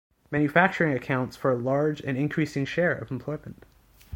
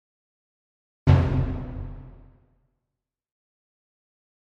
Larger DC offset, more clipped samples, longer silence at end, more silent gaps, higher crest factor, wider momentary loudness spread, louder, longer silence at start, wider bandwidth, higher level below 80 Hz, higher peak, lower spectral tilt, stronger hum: neither; neither; second, 0 s vs 2.3 s; neither; about the same, 22 dB vs 24 dB; second, 12 LU vs 20 LU; second, -26 LUFS vs -23 LUFS; second, 0.3 s vs 1.05 s; first, 17 kHz vs 6.2 kHz; second, -58 dBFS vs -38 dBFS; about the same, -4 dBFS vs -4 dBFS; second, -7 dB/octave vs -9 dB/octave; neither